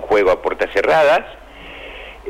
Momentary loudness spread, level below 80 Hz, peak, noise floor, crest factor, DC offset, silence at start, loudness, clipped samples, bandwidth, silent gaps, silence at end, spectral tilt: 22 LU; -44 dBFS; -6 dBFS; -35 dBFS; 10 dB; under 0.1%; 0 s; -15 LUFS; under 0.1%; 15.5 kHz; none; 0 s; -4.5 dB/octave